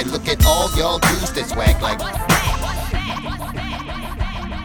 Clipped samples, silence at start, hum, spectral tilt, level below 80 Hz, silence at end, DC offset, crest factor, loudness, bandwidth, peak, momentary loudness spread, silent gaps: under 0.1%; 0 s; none; -4 dB/octave; -24 dBFS; 0 s; under 0.1%; 18 dB; -19 LUFS; 19.5 kHz; -2 dBFS; 11 LU; none